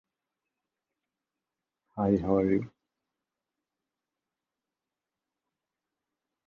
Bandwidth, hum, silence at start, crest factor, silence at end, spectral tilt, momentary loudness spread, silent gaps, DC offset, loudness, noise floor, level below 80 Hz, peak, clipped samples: 6.6 kHz; none; 1.95 s; 24 dB; 3.8 s; -10.5 dB/octave; 19 LU; none; under 0.1%; -28 LUFS; -90 dBFS; -60 dBFS; -12 dBFS; under 0.1%